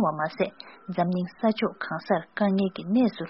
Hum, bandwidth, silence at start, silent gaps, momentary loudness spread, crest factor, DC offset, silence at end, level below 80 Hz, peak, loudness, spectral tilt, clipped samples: none; 5.8 kHz; 0 s; none; 7 LU; 18 dB; under 0.1%; 0 s; -66 dBFS; -8 dBFS; -27 LUFS; -5.5 dB/octave; under 0.1%